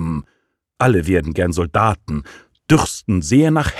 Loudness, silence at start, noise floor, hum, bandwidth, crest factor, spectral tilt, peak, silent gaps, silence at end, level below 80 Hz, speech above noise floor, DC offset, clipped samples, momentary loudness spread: -17 LUFS; 0 s; -66 dBFS; none; 14 kHz; 16 dB; -6 dB/octave; -2 dBFS; none; 0 s; -34 dBFS; 50 dB; under 0.1%; under 0.1%; 13 LU